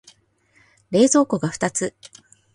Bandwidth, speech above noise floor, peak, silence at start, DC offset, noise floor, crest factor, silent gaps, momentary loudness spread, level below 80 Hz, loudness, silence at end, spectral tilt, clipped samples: 11.5 kHz; 41 dB; -4 dBFS; 0.9 s; under 0.1%; -60 dBFS; 18 dB; none; 10 LU; -62 dBFS; -20 LUFS; 0.5 s; -4.5 dB/octave; under 0.1%